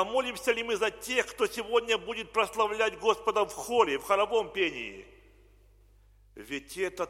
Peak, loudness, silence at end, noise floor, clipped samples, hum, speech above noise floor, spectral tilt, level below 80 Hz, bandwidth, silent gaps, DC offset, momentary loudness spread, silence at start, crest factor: -10 dBFS; -29 LUFS; 0 s; -59 dBFS; under 0.1%; 50 Hz at -60 dBFS; 30 dB; -2.5 dB/octave; -60 dBFS; 16.5 kHz; none; under 0.1%; 10 LU; 0 s; 20 dB